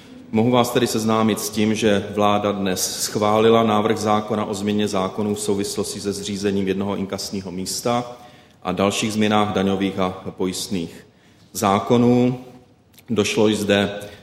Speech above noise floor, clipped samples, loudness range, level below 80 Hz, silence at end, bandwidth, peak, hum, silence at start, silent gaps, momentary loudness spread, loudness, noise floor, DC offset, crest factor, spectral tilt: 31 dB; under 0.1%; 5 LU; -56 dBFS; 0.05 s; 16 kHz; 0 dBFS; none; 0 s; none; 9 LU; -20 LUFS; -51 dBFS; under 0.1%; 20 dB; -4.5 dB/octave